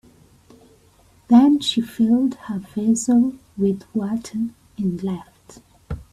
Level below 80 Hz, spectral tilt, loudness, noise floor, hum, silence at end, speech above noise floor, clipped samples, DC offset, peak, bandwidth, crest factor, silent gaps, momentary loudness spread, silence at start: -50 dBFS; -5.5 dB/octave; -20 LUFS; -54 dBFS; none; 0.1 s; 35 dB; under 0.1%; under 0.1%; -2 dBFS; 13 kHz; 18 dB; none; 14 LU; 1.3 s